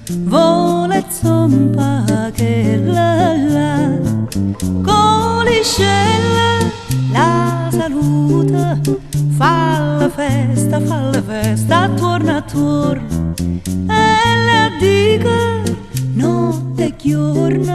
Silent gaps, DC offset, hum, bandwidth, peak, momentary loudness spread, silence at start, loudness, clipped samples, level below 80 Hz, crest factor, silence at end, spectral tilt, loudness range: none; under 0.1%; none; 13 kHz; 0 dBFS; 6 LU; 0 s; -14 LUFS; under 0.1%; -36 dBFS; 12 dB; 0 s; -6 dB/octave; 2 LU